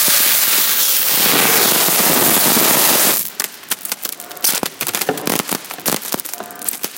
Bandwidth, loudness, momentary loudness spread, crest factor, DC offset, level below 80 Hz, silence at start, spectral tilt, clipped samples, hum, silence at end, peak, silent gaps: over 20 kHz; -13 LUFS; 13 LU; 16 dB; under 0.1%; -60 dBFS; 0 s; -0.5 dB/octave; under 0.1%; none; 0 s; 0 dBFS; none